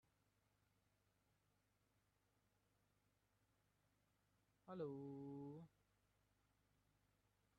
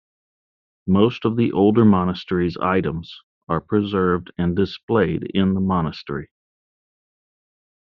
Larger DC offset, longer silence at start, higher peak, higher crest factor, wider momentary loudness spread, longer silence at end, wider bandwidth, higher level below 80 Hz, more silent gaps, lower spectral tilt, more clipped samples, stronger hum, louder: neither; first, 4.65 s vs 0.85 s; second, -40 dBFS vs -4 dBFS; about the same, 22 dB vs 18 dB; second, 10 LU vs 13 LU; first, 1.9 s vs 1.65 s; second, 4.8 kHz vs 6 kHz; second, under -90 dBFS vs -52 dBFS; second, none vs 3.23-3.47 s, 4.83-4.88 s; first, -8.5 dB/octave vs -6.5 dB/octave; neither; first, 50 Hz at -85 dBFS vs none; second, -55 LUFS vs -20 LUFS